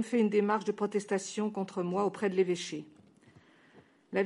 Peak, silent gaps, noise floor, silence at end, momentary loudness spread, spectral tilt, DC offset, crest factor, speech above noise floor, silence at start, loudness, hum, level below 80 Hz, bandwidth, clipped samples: -16 dBFS; none; -61 dBFS; 0 s; 8 LU; -5.5 dB/octave; under 0.1%; 16 dB; 30 dB; 0 s; -32 LUFS; none; -82 dBFS; 11.5 kHz; under 0.1%